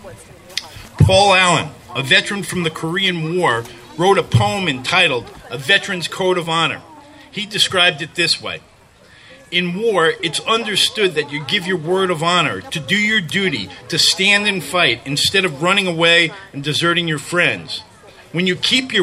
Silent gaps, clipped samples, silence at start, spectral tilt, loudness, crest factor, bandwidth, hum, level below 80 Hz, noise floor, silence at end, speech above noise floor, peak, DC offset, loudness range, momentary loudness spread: none; under 0.1%; 0.05 s; -3.5 dB/octave; -16 LUFS; 18 dB; 16 kHz; none; -44 dBFS; -47 dBFS; 0 s; 30 dB; 0 dBFS; under 0.1%; 4 LU; 13 LU